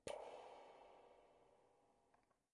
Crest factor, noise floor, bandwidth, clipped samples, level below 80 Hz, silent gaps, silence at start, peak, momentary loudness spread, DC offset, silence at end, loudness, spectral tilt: 24 dB; -81 dBFS; 10.5 kHz; under 0.1%; -86 dBFS; none; 0.05 s; -36 dBFS; 14 LU; under 0.1%; 0.3 s; -59 LUFS; -3 dB/octave